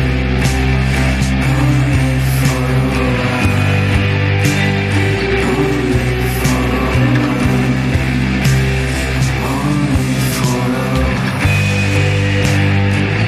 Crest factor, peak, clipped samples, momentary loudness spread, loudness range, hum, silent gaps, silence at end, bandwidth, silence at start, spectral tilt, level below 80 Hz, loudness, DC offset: 12 dB; -2 dBFS; under 0.1%; 2 LU; 1 LU; none; none; 0 s; 15 kHz; 0 s; -6 dB/octave; -22 dBFS; -14 LUFS; under 0.1%